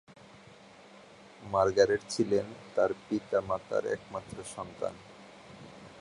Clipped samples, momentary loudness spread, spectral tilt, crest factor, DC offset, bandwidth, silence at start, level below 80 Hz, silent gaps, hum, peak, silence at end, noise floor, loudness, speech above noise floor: under 0.1%; 23 LU; -5 dB/octave; 24 dB; under 0.1%; 11 kHz; 0.95 s; -62 dBFS; none; none; -10 dBFS; 0 s; -54 dBFS; -31 LUFS; 24 dB